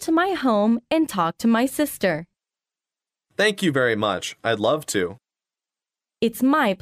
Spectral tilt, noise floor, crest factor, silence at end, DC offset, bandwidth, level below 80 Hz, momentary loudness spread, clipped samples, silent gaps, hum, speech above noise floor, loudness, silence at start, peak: -4.5 dB/octave; under -90 dBFS; 16 dB; 0.05 s; under 0.1%; 15.5 kHz; -62 dBFS; 6 LU; under 0.1%; none; none; over 69 dB; -22 LUFS; 0 s; -6 dBFS